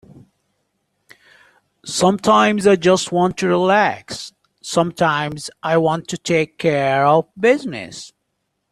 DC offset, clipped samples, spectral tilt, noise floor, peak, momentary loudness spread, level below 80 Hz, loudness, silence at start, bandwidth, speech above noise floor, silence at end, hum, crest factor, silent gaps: under 0.1%; under 0.1%; -5 dB/octave; -73 dBFS; -2 dBFS; 16 LU; -58 dBFS; -17 LUFS; 1.85 s; 13 kHz; 56 dB; 0.65 s; none; 18 dB; none